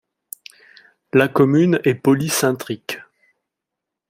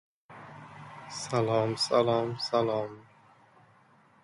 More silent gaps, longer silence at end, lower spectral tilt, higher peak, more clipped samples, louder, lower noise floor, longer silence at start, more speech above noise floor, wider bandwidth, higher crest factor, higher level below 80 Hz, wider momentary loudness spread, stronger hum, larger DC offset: neither; second, 1.1 s vs 1.25 s; about the same, -5.5 dB/octave vs -5 dB/octave; first, -2 dBFS vs -12 dBFS; neither; first, -18 LUFS vs -29 LUFS; first, -83 dBFS vs -61 dBFS; first, 1.15 s vs 0.3 s; first, 67 dB vs 33 dB; first, 16 kHz vs 11.5 kHz; about the same, 18 dB vs 20 dB; first, -60 dBFS vs -70 dBFS; about the same, 21 LU vs 21 LU; neither; neither